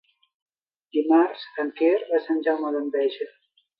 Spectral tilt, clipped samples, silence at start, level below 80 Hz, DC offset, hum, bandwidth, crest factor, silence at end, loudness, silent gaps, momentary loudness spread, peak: -7 dB/octave; under 0.1%; 0.95 s; -84 dBFS; under 0.1%; none; 5.2 kHz; 16 dB; 0.5 s; -24 LUFS; none; 10 LU; -8 dBFS